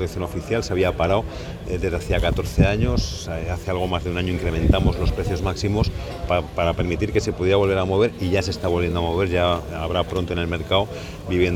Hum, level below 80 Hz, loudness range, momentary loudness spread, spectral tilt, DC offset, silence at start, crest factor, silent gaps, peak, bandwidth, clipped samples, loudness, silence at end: none; -30 dBFS; 2 LU; 7 LU; -6 dB/octave; under 0.1%; 0 s; 20 dB; none; -2 dBFS; 15 kHz; under 0.1%; -22 LUFS; 0 s